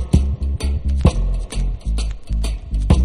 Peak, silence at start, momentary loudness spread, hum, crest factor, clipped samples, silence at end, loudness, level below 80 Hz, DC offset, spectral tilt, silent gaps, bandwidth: 0 dBFS; 0 s; 7 LU; none; 18 dB; under 0.1%; 0 s; -22 LUFS; -20 dBFS; under 0.1%; -7 dB/octave; none; 11 kHz